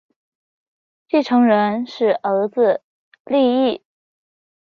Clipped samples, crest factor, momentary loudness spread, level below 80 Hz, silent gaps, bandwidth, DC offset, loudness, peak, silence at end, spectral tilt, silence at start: under 0.1%; 16 dB; 7 LU; -68 dBFS; 2.84-3.12 s, 3.20-3.25 s; 6.6 kHz; under 0.1%; -18 LUFS; -4 dBFS; 0.95 s; -7 dB/octave; 1.15 s